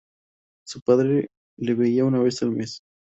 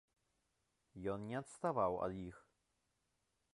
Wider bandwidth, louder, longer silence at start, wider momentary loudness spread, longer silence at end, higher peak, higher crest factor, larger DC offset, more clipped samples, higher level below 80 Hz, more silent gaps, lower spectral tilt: second, 8 kHz vs 11.5 kHz; first, -22 LUFS vs -42 LUFS; second, 0.65 s vs 0.95 s; about the same, 16 LU vs 14 LU; second, 0.35 s vs 1.15 s; first, -6 dBFS vs -24 dBFS; about the same, 18 dB vs 22 dB; neither; neither; first, -64 dBFS vs -70 dBFS; first, 0.82-0.86 s, 1.37-1.57 s vs none; about the same, -7 dB/octave vs -7 dB/octave